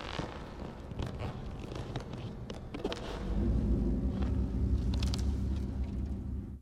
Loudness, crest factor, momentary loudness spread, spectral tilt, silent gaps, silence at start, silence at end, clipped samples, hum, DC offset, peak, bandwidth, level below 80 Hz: -36 LUFS; 16 dB; 11 LU; -7 dB/octave; none; 0 s; 0 s; under 0.1%; none; under 0.1%; -18 dBFS; 10.5 kHz; -36 dBFS